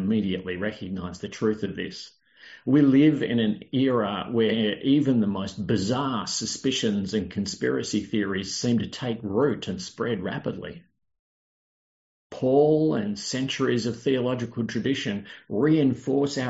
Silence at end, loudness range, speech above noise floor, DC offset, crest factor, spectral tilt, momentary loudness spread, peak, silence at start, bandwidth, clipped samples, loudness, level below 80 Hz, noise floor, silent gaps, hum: 0 s; 6 LU; over 65 dB; under 0.1%; 16 dB; -5.5 dB/octave; 12 LU; -8 dBFS; 0 s; 8 kHz; under 0.1%; -25 LUFS; -62 dBFS; under -90 dBFS; 11.19-12.30 s; none